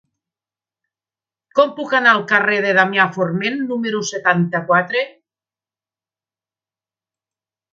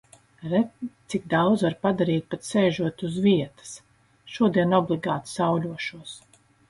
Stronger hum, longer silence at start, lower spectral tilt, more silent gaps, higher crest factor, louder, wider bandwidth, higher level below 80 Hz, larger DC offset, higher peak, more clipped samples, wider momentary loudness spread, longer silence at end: neither; first, 1.55 s vs 0.4 s; second, -4.5 dB/octave vs -6.5 dB/octave; neither; about the same, 20 dB vs 18 dB; first, -16 LUFS vs -24 LUFS; second, 7.6 kHz vs 11.5 kHz; second, -70 dBFS vs -62 dBFS; neither; first, 0 dBFS vs -8 dBFS; neither; second, 8 LU vs 19 LU; first, 2.65 s vs 0.5 s